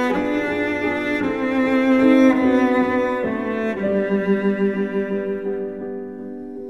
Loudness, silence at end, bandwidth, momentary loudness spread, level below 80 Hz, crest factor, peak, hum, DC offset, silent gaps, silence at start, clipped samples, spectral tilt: -20 LUFS; 0 s; 7.6 kHz; 13 LU; -52 dBFS; 18 dB; -2 dBFS; none; 0.3%; none; 0 s; under 0.1%; -7 dB/octave